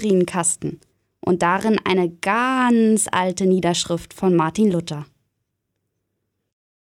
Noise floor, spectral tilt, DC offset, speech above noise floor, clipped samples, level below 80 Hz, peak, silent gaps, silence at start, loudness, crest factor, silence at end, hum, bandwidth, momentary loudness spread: -76 dBFS; -4.5 dB/octave; under 0.1%; 57 dB; under 0.1%; -56 dBFS; -4 dBFS; none; 0 s; -19 LUFS; 16 dB; 1.85 s; none; 15.5 kHz; 9 LU